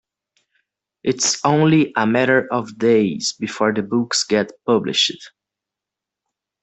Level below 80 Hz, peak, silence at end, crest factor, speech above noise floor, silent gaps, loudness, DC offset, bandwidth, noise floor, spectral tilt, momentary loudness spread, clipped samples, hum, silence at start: -60 dBFS; -2 dBFS; 1.35 s; 16 dB; 68 dB; none; -18 LUFS; under 0.1%; 8.4 kHz; -86 dBFS; -4 dB/octave; 8 LU; under 0.1%; none; 1.05 s